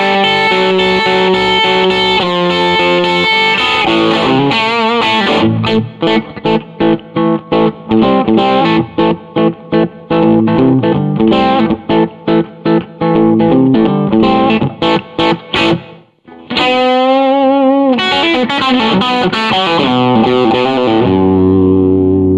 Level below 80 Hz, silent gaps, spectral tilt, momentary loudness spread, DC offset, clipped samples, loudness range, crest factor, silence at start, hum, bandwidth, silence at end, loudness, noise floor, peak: -42 dBFS; none; -6.5 dB/octave; 5 LU; under 0.1%; under 0.1%; 2 LU; 10 dB; 0 s; none; 9.4 kHz; 0 s; -11 LUFS; -37 dBFS; 0 dBFS